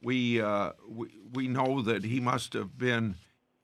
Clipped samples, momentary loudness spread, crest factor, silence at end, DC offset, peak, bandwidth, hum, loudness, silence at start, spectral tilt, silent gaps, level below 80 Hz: under 0.1%; 13 LU; 18 dB; 0.45 s; under 0.1%; -12 dBFS; 13 kHz; none; -31 LUFS; 0.05 s; -6 dB/octave; none; -66 dBFS